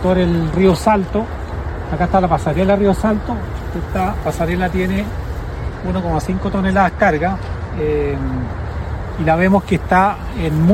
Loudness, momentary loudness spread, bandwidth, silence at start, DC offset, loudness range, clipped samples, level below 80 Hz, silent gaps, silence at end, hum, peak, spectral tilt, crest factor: -18 LUFS; 11 LU; 14 kHz; 0 s; under 0.1%; 4 LU; under 0.1%; -26 dBFS; none; 0 s; none; 0 dBFS; -7.5 dB/octave; 16 dB